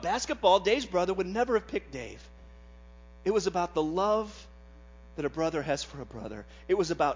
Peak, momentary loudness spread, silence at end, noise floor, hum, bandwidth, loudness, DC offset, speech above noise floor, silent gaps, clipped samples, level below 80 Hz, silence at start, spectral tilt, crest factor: -10 dBFS; 17 LU; 0 s; -51 dBFS; none; 7.6 kHz; -29 LUFS; under 0.1%; 22 dB; none; under 0.1%; -52 dBFS; 0 s; -4.5 dB/octave; 20 dB